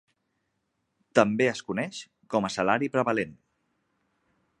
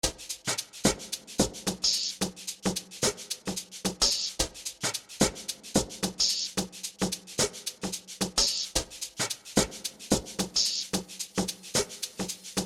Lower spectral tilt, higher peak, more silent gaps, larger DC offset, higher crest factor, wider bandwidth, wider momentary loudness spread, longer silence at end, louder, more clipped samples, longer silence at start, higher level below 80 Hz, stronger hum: first, -5 dB/octave vs -2.5 dB/octave; first, -2 dBFS vs -8 dBFS; neither; neither; about the same, 26 dB vs 24 dB; second, 11 kHz vs 16.5 kHz; about the same, 10 LU vs 9 LU; first, 1.25 s vs 0 s; about the same, -27 LUFS vs -29 LUFS; neither; first, 1.15 s vs 0.05 s; second, -68 dBFS vs -50 dBFS; neither